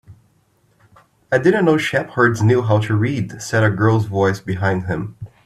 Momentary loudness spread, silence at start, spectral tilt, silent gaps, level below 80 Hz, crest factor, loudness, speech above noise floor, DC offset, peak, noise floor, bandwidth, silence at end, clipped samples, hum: 8 LU; 0.1 s; -6.5 dB/octave; none; -52 dBFS; 16 dB; -17 LUFS; 43 dB; under 0.1%; -2 dBFS; -59 dBFS; 12.5 kHz; 0.2 s; under 0.1%; none